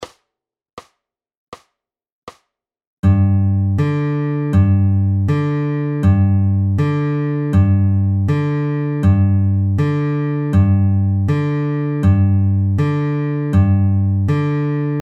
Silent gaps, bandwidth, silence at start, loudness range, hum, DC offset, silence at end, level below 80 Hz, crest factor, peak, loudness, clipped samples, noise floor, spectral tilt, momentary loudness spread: 0.73-0.77 s, 1.37-1.52 s, 2.12-2.27 s, 2.87-3.03 s; 4.7 kHz; 0 s; 3 LU; none; under 0.1%; 0 s; -40 dBFS; 14 dB; -2 dBFS; -16 LUFS; under 0.1%; -84 dBFS; -10 dB/octave; 5 LU